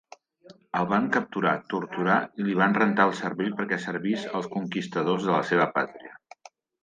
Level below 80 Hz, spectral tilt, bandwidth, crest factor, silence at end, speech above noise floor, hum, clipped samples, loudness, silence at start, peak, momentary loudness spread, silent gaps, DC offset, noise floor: -72 dBFS; -6.5 dB/octave; 9.2 kHz; 18 dB; 0.7 s; 28 dB; none; under 0.1%; -26 LUFS; 0.5 s; -8 dBFS; 9 LU; none; under 0.1%; -54 dBFS